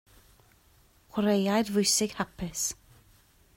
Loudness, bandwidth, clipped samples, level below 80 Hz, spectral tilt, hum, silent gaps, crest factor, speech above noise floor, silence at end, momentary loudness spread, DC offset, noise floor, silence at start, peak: -28 LUFS; 16.5 kHz; under 0.1%; -58 dBFS; -3.5 dB/octave; none; none; 18 dB; 34 dB; 0.85 s; 11 LU; under 0.1%; -62 dBFS; 1.15 s; -12 dBFS